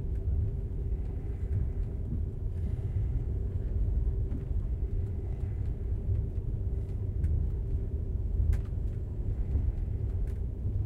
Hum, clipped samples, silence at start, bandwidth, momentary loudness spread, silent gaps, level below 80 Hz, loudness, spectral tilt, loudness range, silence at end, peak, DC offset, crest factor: none; under 0.1%; 0 s; 3 kHz; 4 LU; none; -32 dBFS; -34 LUFS; -10.5 dB/octave; 1 LU; 0 s; -16 dBFS; under 0.1%; 14 dB